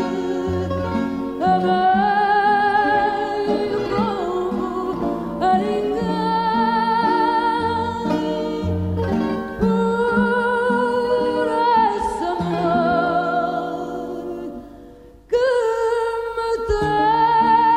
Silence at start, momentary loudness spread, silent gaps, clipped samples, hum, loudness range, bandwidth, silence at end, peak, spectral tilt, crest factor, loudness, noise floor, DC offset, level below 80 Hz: 0 s; 7 LU; none; under 0.1%; none; 4 LU; 14.5 kHz; 0 s; -6 dBFS; -6.5 dB/octave; 14 dB; -20 LUFS; -43 dBFS; under 0.1%; -42 dBFS